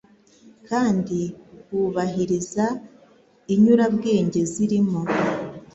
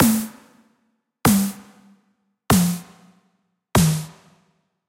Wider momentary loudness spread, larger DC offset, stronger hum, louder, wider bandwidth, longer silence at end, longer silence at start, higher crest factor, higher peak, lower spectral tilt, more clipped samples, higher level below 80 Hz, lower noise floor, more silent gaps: second, 11 LU vs 16 LU; neither; neither; about the same, -22 LUFS vs -20 LUFS; second, 8.2 kHz vs 16 kHz; second, 0.1 s vs 0.8 s; first, 0.45 s vs 0 s; about the same, 18 dB vs 22 dB; about the same, -4 dBFS vs -2 dBFS; first, -6.5 dB/octave vs -5 dB/octave; neither; second, -58 dBFS vs -44 dBFS; second, -54 dBFS vs -69 dBFS; neither